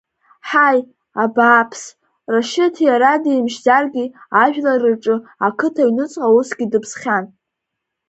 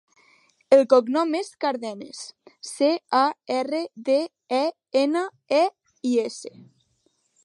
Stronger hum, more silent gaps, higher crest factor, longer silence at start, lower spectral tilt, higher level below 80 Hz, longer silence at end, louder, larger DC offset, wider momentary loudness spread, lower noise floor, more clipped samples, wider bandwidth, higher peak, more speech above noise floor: neither; neither; about the same, 16 dB vs 20 dB; second, 0.45 s vs 0.7 s; about the same, -4.5 dB/octave vs -3.5 dB/octave; first, -66 dBFS vs -82 dBFS; second, 0.8 s vs 0.95 s; first, -16 LUFS vs -23 LUFS; neither; second, 9 LU vs 18 LU; first, -79 dBFS vs -69 dBFS; neither; second, 8.2 kHz vs 11.5 kHz; first, 0 dBFS vs -4 dBFS; first, 63 dB vs 46 dB